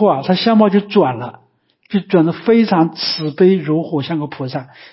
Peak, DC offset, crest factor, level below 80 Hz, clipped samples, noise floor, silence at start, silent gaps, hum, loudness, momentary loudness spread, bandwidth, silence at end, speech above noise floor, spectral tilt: -2 dBFS; under 0.1%; 14 dB; -62 dBFS; under 0.1%; -55 dBFS; 0 s; none; none; -15 LUFS; 12 LU; 5.8 kHz; 0.25 s; 41 dB; -10.5 dB/octave